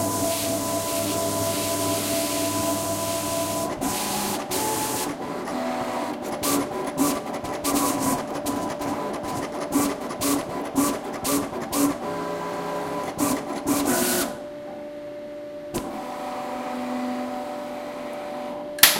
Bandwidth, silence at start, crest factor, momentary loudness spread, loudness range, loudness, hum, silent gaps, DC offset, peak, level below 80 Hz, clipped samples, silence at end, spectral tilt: 16.5 kHz; 0 s; 26 dB; 9 LU; 7 LU; -26 LUFS; none; none; under 0.1%; 0 dBFS; -54 dBFS; under 0.1%; 0 s; -3 dB/octave